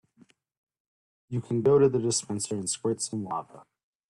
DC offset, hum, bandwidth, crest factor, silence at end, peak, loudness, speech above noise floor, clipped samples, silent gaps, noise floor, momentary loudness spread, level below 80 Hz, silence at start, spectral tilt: under 0.1%; none; 12.5 kHz; 18 dB; 0.5 s; -12 dBFS; -27 LUFS; 35 dB; under 0.1%; none; -62 dBFS; 14 LU; -66 dBFS; 1.3 s; -5 dB/octave